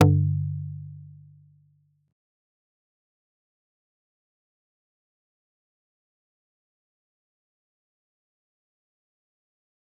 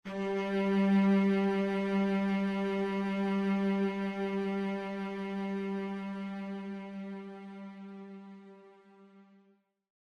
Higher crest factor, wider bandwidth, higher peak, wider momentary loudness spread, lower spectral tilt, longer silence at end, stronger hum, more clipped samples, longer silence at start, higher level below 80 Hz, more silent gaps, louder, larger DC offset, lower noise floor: first, 32 dB vs 14 dB; second, 0.7 kHz vs 6.8 kHz; first, -2 dBFS vs -18 dBFS; first, 24 LU vs 19 LU; about the same, -8.5 dB/octave vs -8 dB/octave; first, 8.9 s vs 0.8 s; neither; neither; about the same, 0 s vs 0.05 s; first, -68 dBFS vs -74 dBFS; neither; first, -26 LUFS vs -32 LUFS; neither; second, -65 dBFS vs -69 dBFS